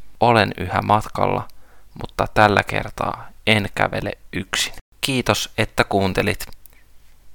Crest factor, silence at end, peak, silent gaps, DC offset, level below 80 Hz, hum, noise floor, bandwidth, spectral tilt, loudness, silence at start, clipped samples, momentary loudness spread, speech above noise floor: 22 dB; 0 s; 0 dBFS; 4.81-4.92 s; under 0.1%; -40 dBFS; none; -45 dBFS; 19 kHz; -4.5 dB/octave; -20 LUFS; 0 s; under 0.1%; 12 LU; 25 dB